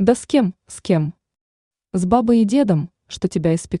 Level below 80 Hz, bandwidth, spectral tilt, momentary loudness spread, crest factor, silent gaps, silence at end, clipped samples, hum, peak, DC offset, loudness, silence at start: -48 dBFS; 11 kHz; -7 dB/octave; 12 LU; 16 dB; 1.41-1.71 s; 0 s; under 0.1%; none; -2 dBFS; under 0.1%; -19 LUFS; 0 s